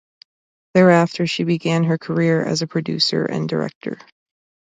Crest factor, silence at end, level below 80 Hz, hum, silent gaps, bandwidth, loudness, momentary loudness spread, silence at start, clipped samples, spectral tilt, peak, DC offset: 18 dB; 0.75 s; -62 dBFS; none; 3.75-3.81 s; 9.2 kHz; -18 LUFS; 12 LU; 0.75 s; under 0.1%; -6 dB/octave; -2 dBFS; under 0.1%